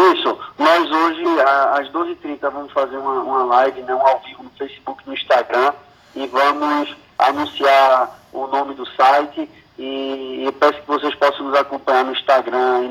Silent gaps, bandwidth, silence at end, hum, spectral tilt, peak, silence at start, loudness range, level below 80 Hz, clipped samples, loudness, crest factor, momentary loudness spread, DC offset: none; 15 kHz; 0 s; none; -3.5 dB/octave; -2 dBFS; 0 s; 3 LU; -62 dBFS; under 0.1%; -17 LUFS; 16 dB; 14 LU; under 0.1%